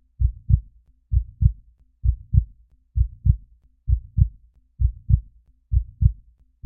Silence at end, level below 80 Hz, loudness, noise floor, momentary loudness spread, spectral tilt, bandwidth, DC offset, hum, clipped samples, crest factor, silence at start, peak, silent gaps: 0.5 s; -26 dBFS; -25 LUFS; -52 dBFS; 6 LU; -18.5 dB/octave; 0.4 kHz; under 0.1%; none; under 0.1%; 20 dB; 0.2 s; -2 dBFS; none